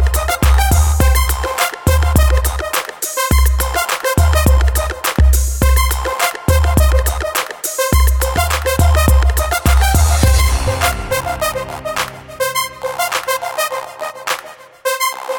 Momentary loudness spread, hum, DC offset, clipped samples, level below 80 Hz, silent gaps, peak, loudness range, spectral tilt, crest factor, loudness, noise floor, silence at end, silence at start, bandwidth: 8 LU; none; under 0.1%; under 0.1%; -16 dBFS; none; 0 dBFS; 5 LU; -4 dB/octave; 14 dB; -15 LUFS; -34 dBFS; 0 s; 0 s; 17.5 kHz